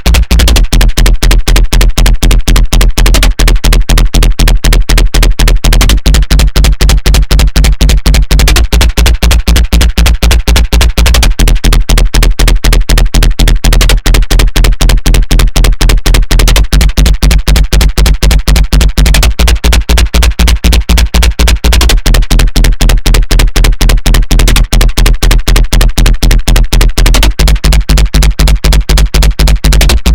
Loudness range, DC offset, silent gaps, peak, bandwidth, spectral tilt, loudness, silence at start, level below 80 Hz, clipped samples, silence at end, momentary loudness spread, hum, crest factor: 1 LU; 10%; none; 0 dBFS; 17.5 kHz; -4 dB/octave; -8 LUFS; 0 s; -6 dBFS; 9%; 0 s; 2 LU; none; 6 dB